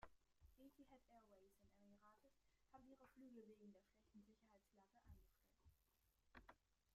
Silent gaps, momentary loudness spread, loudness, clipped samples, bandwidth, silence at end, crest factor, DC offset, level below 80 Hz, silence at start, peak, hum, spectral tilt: none; 4 LU; -68 LUFS; under 0.1%; 13 kHz; 0 s; 26 dB; under 0.1%; -80 dBFS; 0 s; -46 dBFS; none; -6 dB/octave